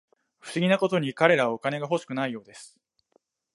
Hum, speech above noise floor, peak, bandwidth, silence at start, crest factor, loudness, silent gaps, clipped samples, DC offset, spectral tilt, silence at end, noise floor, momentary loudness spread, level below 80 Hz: none; 44 dB; -4 dBFS; 11.5 kHz; 0.45 s; 24 dB; -25 LUFS; none; under 0.1%; under 0.1%; -5.5 dB/octave; 0.9 s; -69 dBFS; 22 LU; -76 dBFS